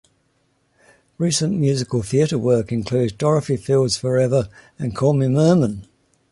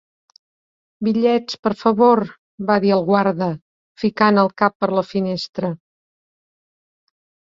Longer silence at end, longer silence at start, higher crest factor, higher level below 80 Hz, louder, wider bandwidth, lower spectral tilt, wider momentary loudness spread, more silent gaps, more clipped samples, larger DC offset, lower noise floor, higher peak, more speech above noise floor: second, 0.5 s vs 1.85 s; first, 1.2 s vs 1 s; about the same, 16 dB vs 18 dB; first, -50 dBFS vs -62 dBFS; about the same, -19 LUFS vs -18 LUFS; first, 11.5 kHz vs 7.4 kHz; about the same, -6 dB/octave vs -7 dB/octave; second, 8 LU vs 11 LU; second, none vs 1.59-1.63 s, 2.38-2.58 s, 3.62-3.95 s, 4.75-4.80 s, 5.49-5.53 s; neither; neither; second, -65 dBFS vs under -90 dBFS; about the same, -4 dBFS vs -2 dBFS; second, 46 dB vs over 73 dB